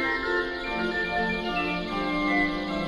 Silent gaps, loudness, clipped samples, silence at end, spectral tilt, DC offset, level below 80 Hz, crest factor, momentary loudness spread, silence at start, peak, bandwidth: none; -27 LUFS; under 0.1%; 0 s; -5.5 dB/octave; under 0.1%; -44 dBFS; 14 dB; 4 LU; 0 s; -14 dBFS; 11.5 kHz